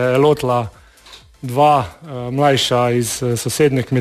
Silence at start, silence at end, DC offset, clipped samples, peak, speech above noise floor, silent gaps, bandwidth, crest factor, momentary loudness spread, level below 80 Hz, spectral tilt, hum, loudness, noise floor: 0 s; 0 s; under 0.1%; under 0.1%; -2 dBFS; 27 dB; none; 14 kHz; 14 dB; 13 LU; -48 dBFS; -5 dB/octave; none; -16 LUFS; -43 dBFS